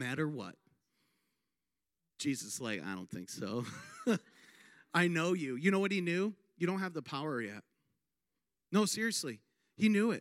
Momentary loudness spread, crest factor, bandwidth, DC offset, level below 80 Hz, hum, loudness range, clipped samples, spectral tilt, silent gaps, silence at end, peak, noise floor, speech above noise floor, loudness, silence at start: 13 LU; 20 dB; 16 kHz; under 0.1%; -86 dBFS; none; 8 LU; under 0.1%; -4.5 dB/octave; none; 0 s; -16 dBFS; under -90 dBFS; over 55 dB; -35 LUFS; 0 s